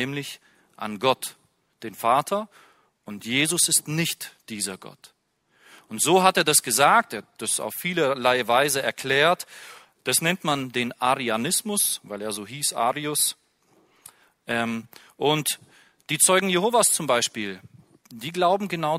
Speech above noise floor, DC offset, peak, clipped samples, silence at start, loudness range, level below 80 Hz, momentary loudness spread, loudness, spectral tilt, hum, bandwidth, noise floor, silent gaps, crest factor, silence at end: 43 dB; under 0.1%; -2 dBFS; under 0.1%; 0 s; 6 LU; -68 dBFS; 17 LU; -22 LUFS; -2.5 dB/octave; none; 16 kHz; -67 dBFS; none; 24 dB; 0 s